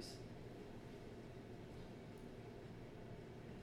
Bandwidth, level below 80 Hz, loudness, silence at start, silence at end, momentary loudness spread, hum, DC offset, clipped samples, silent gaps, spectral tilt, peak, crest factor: 17 kHz; -64 dBFS; -55 LUFS; 0 s; 0 s; 1 LU; none; under 0.1%; under 0.1%; none; -6 dB/octave; -38 dBFS; 16 dB